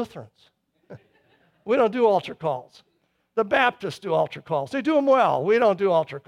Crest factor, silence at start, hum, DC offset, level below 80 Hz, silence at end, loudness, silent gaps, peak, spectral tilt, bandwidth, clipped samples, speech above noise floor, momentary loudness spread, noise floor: 18 dB; 0 s; none; under 0.1%; -68 dBFS; 0.1 s; -22 LUFS; none; -6 dBFS; -6 dB/octave; 12 kHz; under 0.1%; 40 dB; 13 LU; -62 dBFS